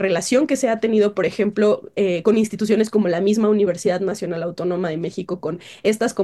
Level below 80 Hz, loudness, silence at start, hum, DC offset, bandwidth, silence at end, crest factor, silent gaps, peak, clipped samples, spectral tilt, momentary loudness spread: -62 dBFS; -20 LUFS; 0 s; none; under 0.1%; 12.5 kHz; 0 s; 16 dB; none; -4 dBFS; under 0.1%; -5.5 dB/octave; 8 LU